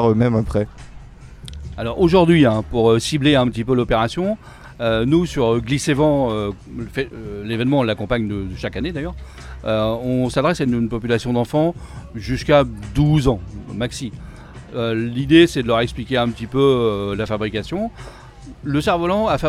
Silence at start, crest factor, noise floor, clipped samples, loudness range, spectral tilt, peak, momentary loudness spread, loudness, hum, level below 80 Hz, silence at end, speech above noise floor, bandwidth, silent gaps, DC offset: 0 s; 18 dB; -38 dBFS; under 0.1%; 5 LU; -6.5 dB/octave; -2 dBFS; 15 LU; -19 LUFS; none; -36 dBFS; 0 s; 20 dB; 13.5 kHz; none; under 0.1%